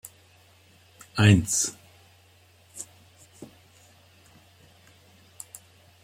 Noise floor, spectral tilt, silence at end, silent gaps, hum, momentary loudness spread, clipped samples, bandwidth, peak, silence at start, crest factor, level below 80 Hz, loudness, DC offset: -58 dBFS; -4.5 dB/octave; 2.6 s; none; none; 29 LU; under 0.1%; 16 kHz; -4 dBFS; 1.15 s; 26 dB; -58 dBFS; -22 LUFS; under 0.1%